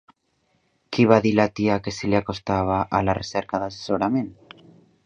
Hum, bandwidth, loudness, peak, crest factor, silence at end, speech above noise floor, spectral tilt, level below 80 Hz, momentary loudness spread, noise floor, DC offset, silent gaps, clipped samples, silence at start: none; 8.4 kHz; -22 LUFS; 0 dBFS; 22 dB; 0.75 s; 47 dB; -6.5 dB/octave; -48 dBFS; 10 LU; -69 dBFS; under 0.1%; none; under 0.1%; 0.9 s